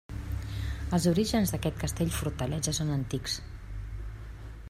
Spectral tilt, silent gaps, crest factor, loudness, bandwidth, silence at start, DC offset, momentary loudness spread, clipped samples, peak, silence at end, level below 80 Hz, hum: -5 dB/octave; none; 18 dB; -31 LUFS; 16 kHz; 0.1 s; under 0.1%; 16 LU; under 0.1%; -14 dBFS; 0 s; -40 dBFS; none